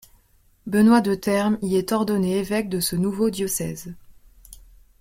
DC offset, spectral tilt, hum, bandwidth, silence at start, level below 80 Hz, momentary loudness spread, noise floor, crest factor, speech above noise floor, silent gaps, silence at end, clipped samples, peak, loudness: under 0.1%; -5.5 dB/octave; none; 16.5 kHz; 0.65 s; -52 dBFS; 12 LU; -59 dBFS; 18 dB; 37 dB; none; 0.45 s; under 0.1%; -4 dBFS; -22 LUFS